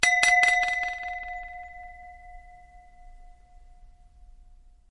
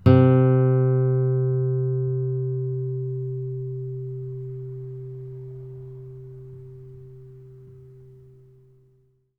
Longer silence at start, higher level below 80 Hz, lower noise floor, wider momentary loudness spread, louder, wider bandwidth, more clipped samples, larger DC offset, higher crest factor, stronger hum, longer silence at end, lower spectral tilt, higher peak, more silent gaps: about the same, 0 s vs 0.05 s; about the same, -50 dBFS vs -54 dBFS; second, -52 dBFS vs -62 dBFS; about the same, 27 LU vs 25 LU; about the same, -23 LUFS vs -23 LUFS; first, 11.5 kHz vs 3.7 kHz; neither; neither; about the same, 26 dB vs 22 dB; neither; second, 1 s vs 1.3 s; second, 0.5 dB/octave vs -12 dB/octave; about the same, -4 dBFS vs -2 dBFS; neither